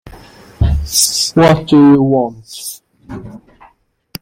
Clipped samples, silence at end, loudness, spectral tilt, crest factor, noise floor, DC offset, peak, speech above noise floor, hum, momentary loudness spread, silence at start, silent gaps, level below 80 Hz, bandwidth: under 0.1%; 0.85 s; -11 LUFS; -4.5 dB/octave; 14 dB; -51 dBFS; under 0.1%; 0 dBFS; 39 dB; none; 23 LU; 0.05 s; none; -28 dBFS; 16.5 kHz